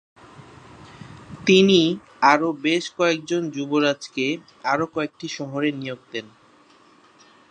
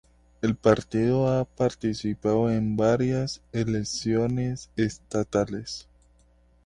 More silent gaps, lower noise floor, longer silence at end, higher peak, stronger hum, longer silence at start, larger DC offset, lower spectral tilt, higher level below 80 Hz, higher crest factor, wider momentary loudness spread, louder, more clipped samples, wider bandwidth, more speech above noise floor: neither; second, -54 dBFS vs -60 dBFS; first, 1.25 s vs 0.85 s; first, 0 dBFS vs -6 dBFS; neither; about the same, 0.4 s vs 0.45 s; neither; second, -5 dB/octave vs -6.5 dB/octave; second, -64 dBFS vs -50 dBFS; about the same, 22 dB vs 20 dB; first, 17 LU vs 8 LU; first, -21 LUFS vs -26 LUFS; neither; about the same, 9.8 kHz vs 10.5 kHz; about the same, 33 dB vs 35 dB